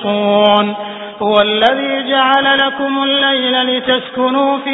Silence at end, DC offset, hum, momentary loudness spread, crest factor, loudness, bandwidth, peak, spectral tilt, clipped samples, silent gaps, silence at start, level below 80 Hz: 0 s; under 0.1%; none; 6 LU; 14 dB; -12 LUFS; 6.2 kHz; 0 dBFS; -6.5 dB/octave; under 0.1%; none; 0 s; -56 dBFS